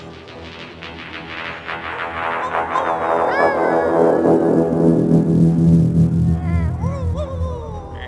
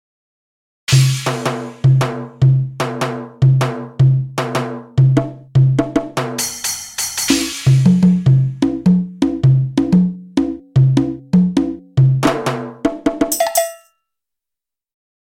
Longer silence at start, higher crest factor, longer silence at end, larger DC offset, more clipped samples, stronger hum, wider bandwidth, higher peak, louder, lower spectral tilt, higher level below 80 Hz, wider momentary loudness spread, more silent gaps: second, 0 s vs 0.9 s; about the same, 16 dB vs 14 dB; second, 0 s vs 1.5 s; neither; neither; neither; second, 11 kHz vs 17 kHz; about the same, -2 dBFS vs 0 dBFS; about the same, -17 LUFS vs -16 LUFS; first, -8.5 dB/octave vs -6 dB/octave; first, -34 dBFS vs -42 dBFS; first, 17 LU vs 8 LU; neither